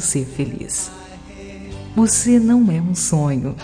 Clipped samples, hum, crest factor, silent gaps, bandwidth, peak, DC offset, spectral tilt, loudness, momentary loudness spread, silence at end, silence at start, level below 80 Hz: under 0.1%; none; 14 dB; none; 10.5 kHz; -4 dBFS; under 0.1%; -5 dB/octave; -17 LUFS; 23 LU; 0 s; 0 s; -42 dBFS